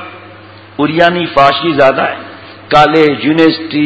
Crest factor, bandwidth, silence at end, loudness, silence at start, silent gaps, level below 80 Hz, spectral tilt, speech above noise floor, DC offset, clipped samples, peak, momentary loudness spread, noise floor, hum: 10 dB; 8 kHz; 0 s; -10 LUFS; 0 s; none; -44 dBFS; -6.5 dB/octave; 25 dB; under 0.1%; 1%; 0 dBFS; 17 LU; -34 dBFS; none